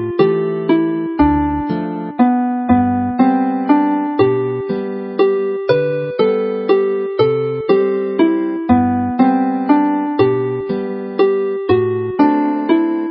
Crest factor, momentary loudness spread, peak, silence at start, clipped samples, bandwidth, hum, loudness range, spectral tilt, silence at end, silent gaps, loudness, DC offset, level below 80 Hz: 14 dB; 6 LU; 0 dBFS; 0 s; under 0.1%; 5.6 kHz; none; 1 LU; -12.5 dB/octave; 0 s; none; -16 LUFS; under 0.1%; -40 dBFS